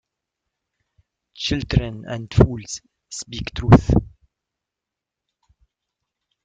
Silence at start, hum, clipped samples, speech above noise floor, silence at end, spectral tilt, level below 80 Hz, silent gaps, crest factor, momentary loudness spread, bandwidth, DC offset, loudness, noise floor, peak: 1.4 s; none; under 0.1%; 67 dB; 2.35 s; -6.5 dB/octave; -34 dBFS; none; 22 dB; 19 LU; 9.2 kHz; under 0.1%; -20 LUFS; -86 dBFS; 0 dBFS